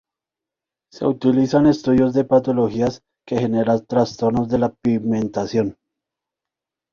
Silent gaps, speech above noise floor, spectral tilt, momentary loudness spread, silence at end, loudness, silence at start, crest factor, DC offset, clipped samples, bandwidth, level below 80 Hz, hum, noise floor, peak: none; 69 dB; -7.5 dB/octave; 7 LU; 1.2 s; -19 LUFS; 0.95 s; 16 dB; under 0.1%; under 0.1%; 7.2 kHz; -50 dBFS; none; -87 dBFS; -4 dBFS